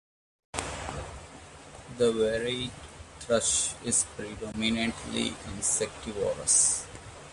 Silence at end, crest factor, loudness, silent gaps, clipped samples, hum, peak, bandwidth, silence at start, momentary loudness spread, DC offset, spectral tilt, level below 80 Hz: 0 s; 20 dB; -28 LUFS; none; under 0.1%; none; -10 dBFS; 11.5 kHz; 0.55 s; 22 LU; under 0.1%; -2 dB/octave; -50 dBFS